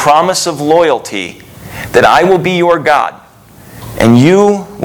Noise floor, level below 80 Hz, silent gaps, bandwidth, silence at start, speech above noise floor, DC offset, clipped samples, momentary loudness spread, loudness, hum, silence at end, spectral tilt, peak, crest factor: -38 dBFS; -42 dBFS; none; over 20 kHz; 0 s; 29 dB; under 0.1%; 1%; 17 LU; -9 LUFS; none; 0 s; -5 dB/octave; 0 dBFS; 10 dB